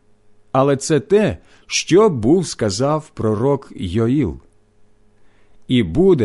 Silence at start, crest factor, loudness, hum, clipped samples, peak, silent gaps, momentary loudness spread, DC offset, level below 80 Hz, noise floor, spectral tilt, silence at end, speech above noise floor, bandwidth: 0.55 s; 14 dB; -17 LUFS; none; under 0.1%; -4 dBFS; none; 8 LU; under 0.1%; -40 dBFS; -51 dBFS; -5.5 dB/octave; 0 s; 34 dB; 11.5 kHz